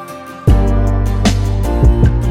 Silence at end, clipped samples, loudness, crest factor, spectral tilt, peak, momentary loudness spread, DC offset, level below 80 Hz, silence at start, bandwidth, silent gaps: 0 s; under 0.1%; -14 LUFS; 10 dB; -7 dB/octave; 0 dBFS; 5 LU; under 0.1%; -14 dBFS; 0 s; 12.5 kHz; none